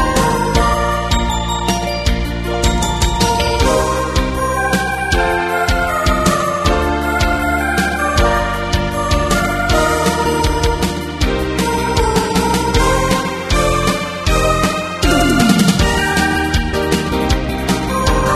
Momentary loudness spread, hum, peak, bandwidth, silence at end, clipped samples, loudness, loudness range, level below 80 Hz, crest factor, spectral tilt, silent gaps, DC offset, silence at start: 4 LU; none; 0 dBFS; 13.5 kHz; 0 s; under 0.1%; -15 LUFS; 2 LU; -22 dBFS; 14 dB; -4.5 dB/octave; none; under 0.1%; 0 s